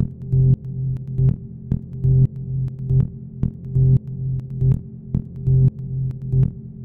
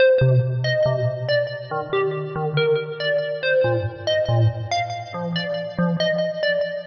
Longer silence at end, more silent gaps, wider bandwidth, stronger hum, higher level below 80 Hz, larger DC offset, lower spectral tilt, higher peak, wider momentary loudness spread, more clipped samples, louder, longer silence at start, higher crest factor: about the same, 0 s vs 0 s; neither; second, 1.1 kHz vs 6.6 kHz; neither; first, -34 dBFS vs -52 dBFS; neither; first, -13 dB/octave vs -4.5 dB/octave; about the same, -6 dBFS vs -8 dBFS; first, 10 LU vs 7 LU; neither; about the same, -21 LUFS vs -22 LUFS; about the same, 0 s vs 0 s; about the same, 14 dB vs 12 dB